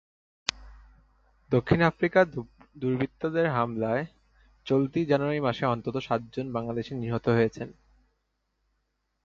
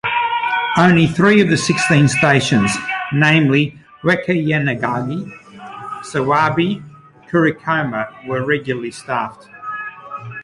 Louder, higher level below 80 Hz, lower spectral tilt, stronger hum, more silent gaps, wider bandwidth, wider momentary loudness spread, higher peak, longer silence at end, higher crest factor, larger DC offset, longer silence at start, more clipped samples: second, -27 LUFS vs -16 LUFS; about the same, -56 dBFS vs -52 dBFS; about the same, -6.5 dB/octave vs -5.5 dB/octave; neither; neither; second, 7.8 kHz vs 11.5 kHz; second, 10 LU vs 16 LU; about the same, 0 dBFS vs 0 dBFS; first, 1.5 s vs 0 s; first, 28 dB vs 16 dB; neither; first, 0.55 s vs 0.05 s; neither